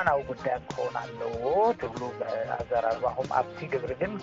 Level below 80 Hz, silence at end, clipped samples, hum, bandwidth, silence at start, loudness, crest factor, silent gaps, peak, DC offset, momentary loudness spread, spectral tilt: -56 dBFS; 0 s; under 0.1%; none; 7.6 kHz; 0 s; -30 LUFS; 22 dB; none; -8 dBFS; under 0.1%; 8 LU; -4.5 dB/octave